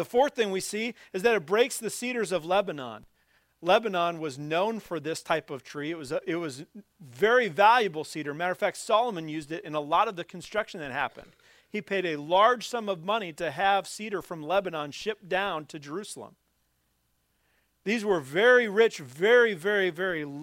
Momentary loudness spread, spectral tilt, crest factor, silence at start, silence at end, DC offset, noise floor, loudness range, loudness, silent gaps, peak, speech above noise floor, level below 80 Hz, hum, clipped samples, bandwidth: 15 LU; -4 dB/octave; 20 dB; 0 s; 0 s; under 0.1%; -73 dBFS; 7 LU; -27 LUFS; none; -6 dBFS; 46 dB; -68 dBFS; none; under 0.1%; 16 kHz